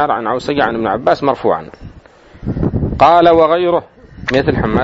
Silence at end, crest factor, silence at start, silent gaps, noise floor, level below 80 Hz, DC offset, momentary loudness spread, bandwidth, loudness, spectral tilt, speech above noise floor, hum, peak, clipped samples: 0 s; 14 dB; 0 s; none; -41 dBFS; -32 dBFS; under 0.1%; 13 LU; 8 kHz; -13 LUFS; -7.5 dB/octave; 28 dB; none; 0 dBFS; under 0.1%